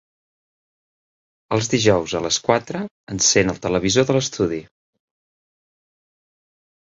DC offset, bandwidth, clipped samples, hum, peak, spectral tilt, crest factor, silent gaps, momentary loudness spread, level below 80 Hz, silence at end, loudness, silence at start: under 0.1%; 8 kHz; under 0.1%; none; -2 dBFS; -3.5 dB/octave; 22 dB; 2.91-3.07 s; 12 LU; -50 dBFS; 2.25 s; -19 LUFS; 1.5 s